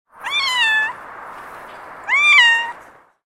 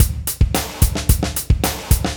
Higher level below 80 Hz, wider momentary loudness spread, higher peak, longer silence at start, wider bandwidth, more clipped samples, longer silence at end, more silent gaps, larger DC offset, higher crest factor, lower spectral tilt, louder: second, -62 dBFS vs -20 dBFS; first, 26 LU vs 1 LU; about the same, 0 dBFS vs 0 dBFS; first, 0.2 s vs 0 s; second, 16 kHz vs over 20 kHz; neither; first, 0.5 s vs 0 s; neither; neither; about the same, 18 dB vs 18 dB; second, 1.5 dB/octave vs -4.5 dB/octave; first, -14 LUFS vs -19 LUFS